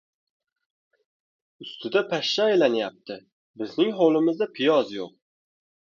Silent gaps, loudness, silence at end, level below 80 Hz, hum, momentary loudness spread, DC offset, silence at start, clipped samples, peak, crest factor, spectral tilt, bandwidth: 3.32-3.54 s; -23 LUFS; 0.75 s; -76 dBFS; none; 19 LU; under 0.1%; 1.6 s; under 0.1%; -6 dBFS; 20 dB; -5 dB/octave; 7.2 kHz